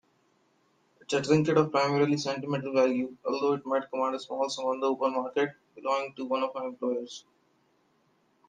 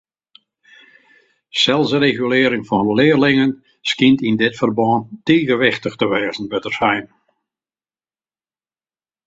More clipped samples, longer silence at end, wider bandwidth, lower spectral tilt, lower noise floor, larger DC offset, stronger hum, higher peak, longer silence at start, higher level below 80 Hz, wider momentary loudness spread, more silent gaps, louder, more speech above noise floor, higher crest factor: neither; second, 1.3 s vs 2.2 s; first, 9.6 kHz vs 7.8 kHz; about the same, -5.5 dB/octave vs -5.5 dB/octave; second, -69 dBFS vs under -90 dBFS; neither; neither; second, -10 dBFS vs 0 dBFS; second, 1.1 s vs 1.55 s; second, -74 dBFS vs -56 dBFS; about the same, 8 LU vs 8 LU; neither; second, -29 LUFS vs -16 LUFS; second, 41 dB vs over 74 dB; about the same, 20 dB vs 18 dB